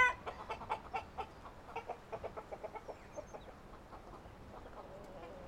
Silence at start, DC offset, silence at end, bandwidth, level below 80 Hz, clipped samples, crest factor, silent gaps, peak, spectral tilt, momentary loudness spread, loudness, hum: 0 s; under 0.1%; 0 s; 16 kHz; -60 dBFS; under 0.1%; 26 dB; none; -18 dBFS; -4 dB/octave; 12 LU; -46 LUFS; none